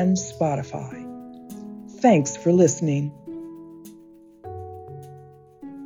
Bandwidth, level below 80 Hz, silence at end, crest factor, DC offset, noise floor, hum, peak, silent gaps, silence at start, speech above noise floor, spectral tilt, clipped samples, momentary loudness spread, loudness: 11 kHz; -64 dBFS; 0 s; 20 dB; under 0.1%; -49 dBFS; none; -4 dBFS; none; 0 s; 28 dB; -6.5 dB/octave; under 0.1%; 25 LU; -22 LUFS